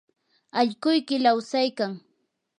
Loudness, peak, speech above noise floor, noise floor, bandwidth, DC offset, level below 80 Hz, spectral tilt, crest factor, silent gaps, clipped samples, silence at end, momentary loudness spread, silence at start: -24 LUFS; -6 dBFS; 50 dB; -73 dBFS; 10 kHz; under 0.1%; -82 dBFS; -4.5 dB/octave; 18 dB; none; under 0.1%; 0.6 s; 9 LU; 0.55 s